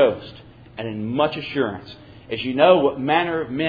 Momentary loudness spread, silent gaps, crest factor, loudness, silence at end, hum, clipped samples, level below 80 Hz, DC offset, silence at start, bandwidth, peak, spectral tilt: 21 LU; none; 20 dB; -21 LUFS; 0 s; none; under 0.1%; -54 dBFS; under 0.1%; 0 s; 5 kHz; -2 dBFS; -8.5 dB/octave